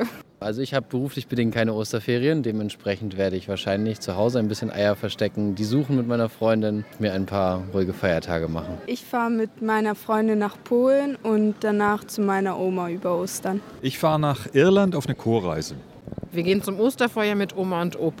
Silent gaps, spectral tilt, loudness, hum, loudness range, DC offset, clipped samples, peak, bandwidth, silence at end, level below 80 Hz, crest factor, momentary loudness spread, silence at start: none; -6 dB/octave; -24 LUFS; none; 2 LU; under 0.1%; under 0.1%; -6 dBFS; 16.5 kHz; 0 s; -54 dBFS; 18 dB; 7 LU; 0 s